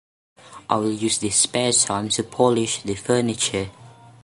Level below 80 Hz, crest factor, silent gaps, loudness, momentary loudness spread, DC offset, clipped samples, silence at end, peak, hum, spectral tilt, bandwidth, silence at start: -54 dBFS; 20 dB; none; -21 LUFS; 8 LU; under 0.1%; under 0.1%; 0.35 s; -2 dBFS; none; -3 dB/octave; 11.5 kHz; 0.45 s